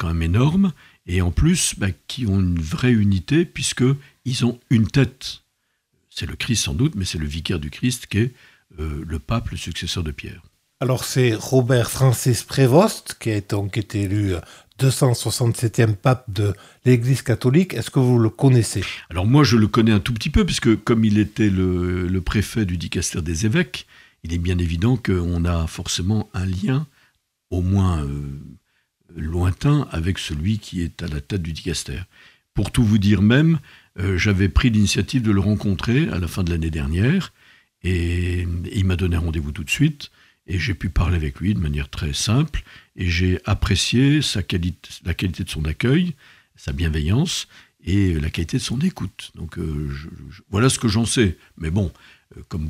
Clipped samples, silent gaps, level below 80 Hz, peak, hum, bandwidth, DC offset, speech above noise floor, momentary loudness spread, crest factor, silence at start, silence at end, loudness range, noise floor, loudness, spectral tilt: under 0.1%; none; -36 dBFS; -2 dBFS; none; 15.5 kHz; under 0.1%; 51 dB; 12 LU; 18 dB; 0 s; 0 s; 6 LU; -71 dBFS; -21 LUFS; -5.5 dB/octave